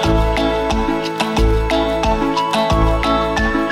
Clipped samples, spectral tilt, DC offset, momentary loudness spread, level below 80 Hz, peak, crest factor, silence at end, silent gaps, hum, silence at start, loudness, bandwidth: under 0.1%; -5.5 dB/octave; under 0.1%; 3 LU; -22 dBFS; -4 dBFS; 12 dB; 0 s; none; none; 0 s; -17 LUFS; 15 kHz